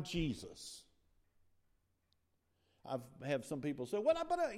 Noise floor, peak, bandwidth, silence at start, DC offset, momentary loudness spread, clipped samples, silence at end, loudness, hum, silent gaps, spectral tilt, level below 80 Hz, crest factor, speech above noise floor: -80 dBFS; -22 dBFS; 15 kHz; 0 s; under 0.1%; 16 LU; under 0.1%; 0 s; -40 LUFS; none; none; -5.5 dB/octave; -62 dBFS; 20 dB; 41 dB